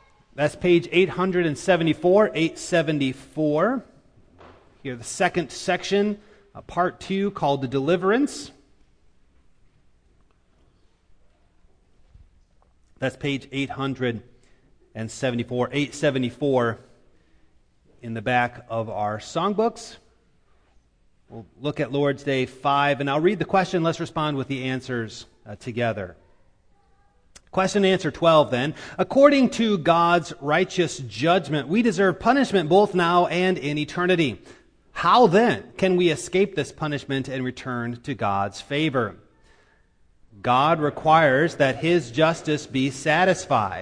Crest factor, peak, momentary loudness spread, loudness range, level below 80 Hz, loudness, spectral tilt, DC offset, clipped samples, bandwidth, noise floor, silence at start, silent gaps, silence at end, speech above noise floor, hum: 22 dB; -2 dBFS; 12 LU; 9 LU; -56 dBFS; -22 LUFS; -5.5 dB/octave; under 0.1%; under 0.1%; 10.5 kHz; -61 dBFS; 0.35 s; none; 0 s; 39 dB; none